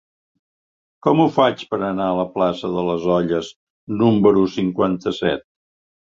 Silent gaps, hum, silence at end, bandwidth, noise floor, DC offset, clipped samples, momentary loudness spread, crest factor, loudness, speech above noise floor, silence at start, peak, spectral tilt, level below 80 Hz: 3.56-3.87 s; none; 0.7 s; 7.6 kHz; under -90 dBFS; under 0.1%; under 0.1%; 9 LU; 20 dB; -19 LUFS; over 72 dB; 1.05 s; 0 dBFS; -7.5 dB/octave; -52 dBFS